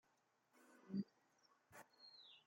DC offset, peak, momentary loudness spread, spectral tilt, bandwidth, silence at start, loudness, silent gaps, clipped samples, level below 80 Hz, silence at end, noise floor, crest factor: under 0.1%; -34 dBFS; 16 LU; -6.5 dB/octave; 16.5 kHz; 0.55 s; -53 LUFS; none; under 0.1%; under -90 dBFS; 0.05 s; -82 dBFS; 22 dB